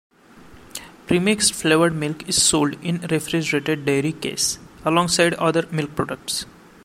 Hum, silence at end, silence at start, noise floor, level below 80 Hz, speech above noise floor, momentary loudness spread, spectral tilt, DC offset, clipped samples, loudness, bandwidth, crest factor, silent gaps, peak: none; 0.35 s; 0.35 s; -46 dBFS; -52 dBFS; 26 dB; 10 LU; -3.5 dB/octave; under 0.1%; under 0.1%; -20 LUFS; 16.5 kHz; 18 dB; none; -2 dBFS